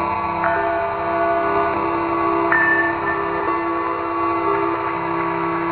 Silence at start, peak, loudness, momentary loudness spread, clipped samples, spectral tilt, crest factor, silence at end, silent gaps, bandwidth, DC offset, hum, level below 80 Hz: 0 s; -2 dBFS; -19 LUFS; 6 LU; under 0.1%; -10.5 dB/octave; 18 dB; 0 s; none; 4.6 kHz; under 0.1%; none; -48 dBFS